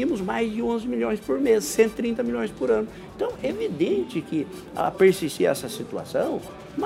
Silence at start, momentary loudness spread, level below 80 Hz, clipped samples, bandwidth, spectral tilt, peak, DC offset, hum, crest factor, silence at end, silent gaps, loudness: 0 s; 11 LU; -54 dBFS; under 0.1%; 16 kHz; -5 dB/octave; -6 dBFS; under 0.1%; none; 18 dB; 0 s; none; -25 LUFS